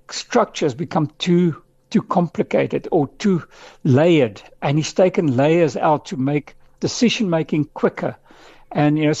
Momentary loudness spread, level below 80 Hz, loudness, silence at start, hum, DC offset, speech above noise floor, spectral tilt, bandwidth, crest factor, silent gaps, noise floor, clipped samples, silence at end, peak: 9 LU; -54 dBFS; -19 LUFS; 0.1 s; none; under 0.1%; 24 dB; -6 dB/octave; 8.2 kHz; 14 dB; none; -42 dBFS; under 0.1%; 0 s; -4 dBFS